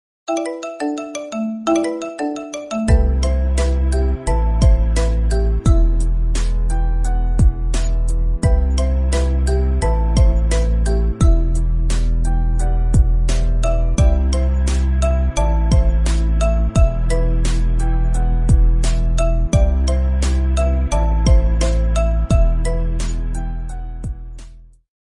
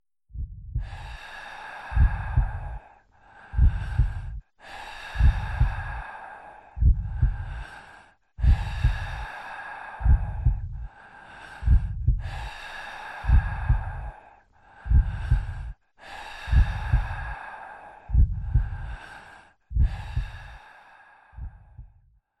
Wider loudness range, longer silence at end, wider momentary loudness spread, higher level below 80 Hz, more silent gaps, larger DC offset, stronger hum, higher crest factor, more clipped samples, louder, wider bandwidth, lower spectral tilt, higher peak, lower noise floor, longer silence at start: about the same, 2 LU vs 2 LU; about the same, 0.45 s vs 0.55 s; second, 8 LU vs 19 LU; first, -16 dBFS vs -28 dBFS; neither; neither; neither; second, 12 dB vs 18 dB; neither; first, -19 LUFS vs -28 LUFS; first, 11 kHz vs 8.2 kHz; about the same, -6.5 dB/octave vs -7 dB/octave; first, -2 dBFS vs -8 dBFS; second, -39 dBFS vs -60 dBFS; about the same, 0.3 s vs 0.35 s